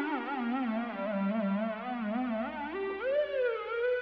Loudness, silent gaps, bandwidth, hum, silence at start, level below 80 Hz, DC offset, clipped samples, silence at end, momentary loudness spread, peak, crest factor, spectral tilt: -33 LUFS; none; 5.6 kHz; none; 0 s; -68 dBFS; under 0.1%; under 0.1%; 0 s; 4 LU; -20 dBFS; 12 dB; -9 dB/octave